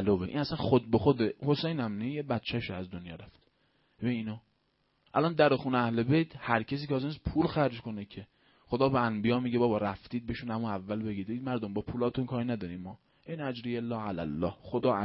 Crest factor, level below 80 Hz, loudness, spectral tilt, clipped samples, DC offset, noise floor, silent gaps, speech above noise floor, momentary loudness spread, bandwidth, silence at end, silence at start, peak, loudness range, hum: 22 dB; -56 dBFS; -31 LUFS; -10.5 dB/octave; under 0.1%; under 0.1%; -74 dBFS; none; 43 dB; 14 LU; 5.8 kHz; 0 s; 0 s; -10 dBFS; 5 LU; none